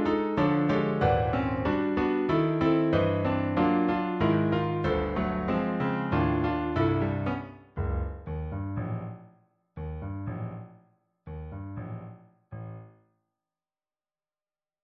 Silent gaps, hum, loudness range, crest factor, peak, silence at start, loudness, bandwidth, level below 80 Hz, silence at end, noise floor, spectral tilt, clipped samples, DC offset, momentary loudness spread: none; none; 18 LU; 16 dB; -12 dBFS; 0 s; -28 LUFS; 6.2 kHz; -42 dBFS; 1.95 s; under -90 dBFS; -9.5 dB/octave; under 0.1%; under 0.1%; 17 LU